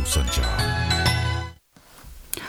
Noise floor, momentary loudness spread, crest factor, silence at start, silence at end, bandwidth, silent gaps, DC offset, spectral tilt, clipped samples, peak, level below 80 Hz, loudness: -50 dBFS; 11 LU; 20 dB; 0 s; 0 s; over 20 kHz; none; under 0.1%; -3.5 dB/octave; under 0.1%; -4 dBFS; -30 dBFS; -23 LUFS